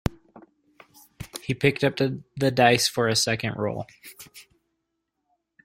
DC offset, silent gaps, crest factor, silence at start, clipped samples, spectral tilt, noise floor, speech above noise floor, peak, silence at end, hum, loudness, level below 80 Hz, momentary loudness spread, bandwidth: under 0.1%; none; 22 dB; 0.05 s; under 0.1%; -4 dB/octave; -79 dBFS; 55 dB; -4 dBFS; 1.25 s; none; -23 LUFS; -52 dBFS; 24 LU; 16.5 kHz